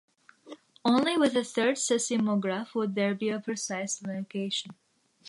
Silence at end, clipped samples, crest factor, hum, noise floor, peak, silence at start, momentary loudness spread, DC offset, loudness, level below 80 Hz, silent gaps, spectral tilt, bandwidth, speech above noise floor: 0 s; under 0.1%; 18 dB; none; -50 dBFS; -12 dBFS; 0.45 s; 9 LU; under 0.1%; -29 LUFS; -80 dBFS; none; -4 dB/octave; 11.5 kHz; 22 dB